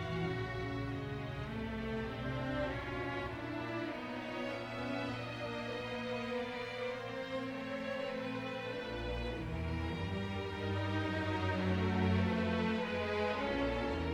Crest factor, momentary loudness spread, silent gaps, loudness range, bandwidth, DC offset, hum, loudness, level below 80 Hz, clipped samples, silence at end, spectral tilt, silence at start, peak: 16 dB; 7 LU; none; 5 LU; 12 kHz; under 0.1%; none; -38 LUFS; -52 dBFS; under 0.1%; 0 s; -7 dB/octave; 0 s; -20 dBFS